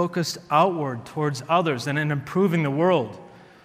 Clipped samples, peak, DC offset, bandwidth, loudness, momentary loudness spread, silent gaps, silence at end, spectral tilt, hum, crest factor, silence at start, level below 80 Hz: under 0.1%; -6 dBFS; under 0.1%; 16 kHz; -23 LUFS; 8 LU; none; 0.25 s; -6 dB/octave; none; 18 dB; 0 s; -66 dBFS